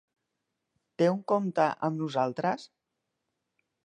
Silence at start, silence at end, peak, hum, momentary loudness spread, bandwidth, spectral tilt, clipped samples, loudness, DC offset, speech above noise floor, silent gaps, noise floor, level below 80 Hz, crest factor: 1 s; 1.2 s; -12 dBFS; none; 6 LU; 9.8 kHz; -7 dB/octave; under 0.1%; -29 LUFS; under 0.1%; 55 dB; none; -83 dBFS; -80 dBFS; 20 dB